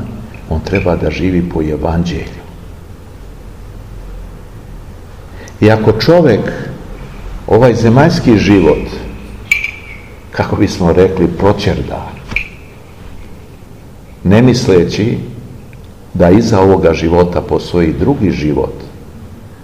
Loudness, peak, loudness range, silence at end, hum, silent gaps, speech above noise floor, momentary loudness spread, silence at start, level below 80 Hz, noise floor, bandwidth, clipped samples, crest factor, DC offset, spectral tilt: -11 LUFS; 0 dBFS; 8 LU; 0 s; none; none; 24 dB; 25 LU; 0 s; -30 dBFS; -34 dBFS; 15 kHz; 1%; 12 dB; 0.9%; -7 dB/octave